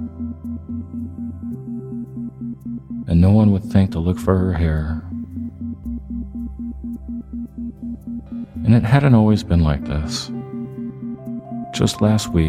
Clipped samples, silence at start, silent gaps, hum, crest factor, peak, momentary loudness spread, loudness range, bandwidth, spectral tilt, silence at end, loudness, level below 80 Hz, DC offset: under 0.1%; 0 s; none; none; 18 dB; 0 dBFS; 16 LU; 11 LU; 14 kHz; -7 dB/octave; 0 s; -21 LUFS; -34 dBFS; under 0.1%